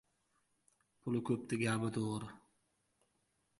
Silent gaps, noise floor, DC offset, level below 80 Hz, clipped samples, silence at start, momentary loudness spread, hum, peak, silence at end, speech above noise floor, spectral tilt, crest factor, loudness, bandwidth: none; -80 dBFS; under 0.1%; -74 dBFS; under 0.1%; 1.05 s; 11 LU; none; -20 dBFS; 1.2 s; 43 dB; -6 dB/octave; 20 dB; -38 LUFS; 11.5 kHz